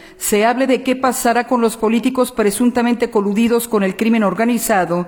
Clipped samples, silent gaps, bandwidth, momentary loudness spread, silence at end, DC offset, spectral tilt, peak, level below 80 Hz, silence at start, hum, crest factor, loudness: under 0.1%; none; 19 kHz; 2 LU; 0 s; under 0.1%; -4.5 dB/octave; -4 dBFS; -50 dBFS; 0.05 s; none; 12 dB; -16 LUFS